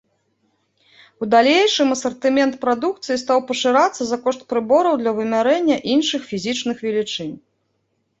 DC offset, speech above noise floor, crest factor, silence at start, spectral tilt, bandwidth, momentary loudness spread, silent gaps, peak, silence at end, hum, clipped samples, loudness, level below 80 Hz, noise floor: under 0.1%; 51 dB; 18 dB; 1.2 s; -3.5 dB/octave; 8.2 kHz; 9 LU; none; -2 dBFS; 0.8 s; none; under 0.1%; -18 LUFS; -64 dBFS; -69 dBFS